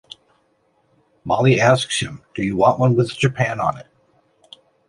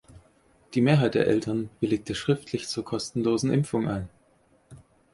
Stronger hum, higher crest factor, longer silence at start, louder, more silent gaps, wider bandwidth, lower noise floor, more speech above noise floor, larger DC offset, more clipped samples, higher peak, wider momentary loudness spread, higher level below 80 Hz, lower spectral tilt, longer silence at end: neither; about the same, 20 dB vs 20 dB; first, 1.25 s vs 0.15 s; first, -18 LUFS vs -26 LUFS; neither; about the same, 11.5 kHz vs 11.5 kHz; about the same, -63 dBFS vs -63 dBFS; first, 45 dB vs 38 dB; neither; neither; first, 0 dBFS vs -8 dBFS; first, 12 LU vs 9 LU; about the same, -52 dBFS vs -56 dBFS; about the same, -5.5 dB/octave vs -6.5 dB/octave; first, 1.05 s vs 0.35 s